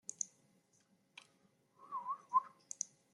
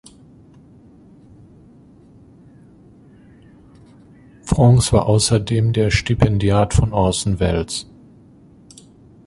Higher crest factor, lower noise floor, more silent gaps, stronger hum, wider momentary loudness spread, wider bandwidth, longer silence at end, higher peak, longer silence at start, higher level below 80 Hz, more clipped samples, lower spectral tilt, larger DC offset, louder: first, 26 dB vs 18 dB; first, -75 dBFS vs -47 dBFS; neither; neither; first, 23 LU vs 11 LU; about the same, 12 kHz vs 11.5 kHz; second, 0.25 s vs 1.45 s; second, -20 dBFS vs -2 dBFS; second, 0.2 s vs 4.45 s; second, under -90 dBFS vs -32 dBFS; neither; second, 0 dB/octave vs -5.5 dB/octave; neither; second, -41 LUFS vs -17 LUFS